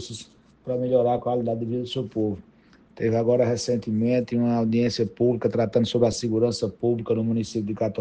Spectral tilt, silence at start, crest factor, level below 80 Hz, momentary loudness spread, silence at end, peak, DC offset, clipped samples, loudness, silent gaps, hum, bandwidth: -6.5 dB/octave; 0 s; 18 dB; -56 dBFS; 7 LU; 0 s; -6 dBFS; under 0.1%; under 0.1%; -24 LUFS; none; none; 9.4 kHz